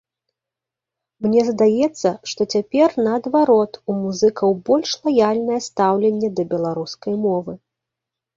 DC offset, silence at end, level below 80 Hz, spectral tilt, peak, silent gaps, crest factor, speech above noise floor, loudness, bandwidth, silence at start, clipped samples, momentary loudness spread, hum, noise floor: under 0.1%; 0.8 s; -62 dBFS; -5.5 dB/octave; -4 dBFS; none; 16 dB; 68 dB; -19 LUFS; 7.8 kHz; 1.2 s; under 0.1%; 8 LU; none; -86 dBFS